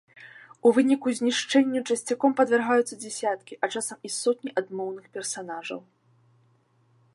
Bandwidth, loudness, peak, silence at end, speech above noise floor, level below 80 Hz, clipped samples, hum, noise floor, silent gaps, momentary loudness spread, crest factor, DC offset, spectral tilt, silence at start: 11.5 kHz; -26 LUFS; -8 dBFS; 1.35 s; 39 dB; -82 dBFS; under 0.1%; none; -64 dBFS; none; 13 LU; 20 dB; under 0.1%; -3 dB/octave; 0.2 s